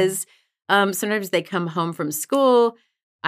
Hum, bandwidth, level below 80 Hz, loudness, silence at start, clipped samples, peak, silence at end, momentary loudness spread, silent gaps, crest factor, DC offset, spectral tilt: none; 16 kHz; -82 dBFS; -21 LUFS; 0 s; under 0.1%; -4 dBFS; 0 s; 9 LU; 3.03-3.19 s; 18 dB; under 0.1%; -4 dB/octave